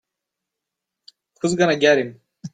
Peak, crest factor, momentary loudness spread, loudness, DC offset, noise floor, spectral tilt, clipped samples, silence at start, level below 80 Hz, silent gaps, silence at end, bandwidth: -2 dBFS; 20 dB; 16 LU; -19 LUFS; under 0.1%; -83 dBFS; -4.5 dB/octave; under 0.1%; 1.45 s; -64 dBFS; none; 0.05 s; 9.4 kHz